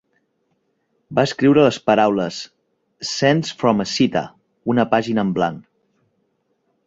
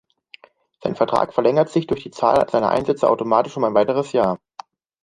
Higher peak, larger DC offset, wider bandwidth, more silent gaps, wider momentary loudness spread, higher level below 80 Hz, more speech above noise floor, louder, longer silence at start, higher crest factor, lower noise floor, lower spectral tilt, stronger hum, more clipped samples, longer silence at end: about the same, -2 dBFS vs -2 dBFS; neither; second, 7.8 kHz vs 11 kHz; neither; first, 14 LU vs 6 LU; about the same, -58 dBFS vs -56 dBFS; first, 51 dB vs 30 dB; about the same, -18 LUFS vs -19 LUFS; first, 1.1 s vs 0.85 s; about the same, 18 dB vs 18 dB; first, -68 dBFS vs -49 dBFS; about the same, -5.5 dB/octave vs -6.5 dB/octave; neither; neither; first, 1.25 s vs 0.65 s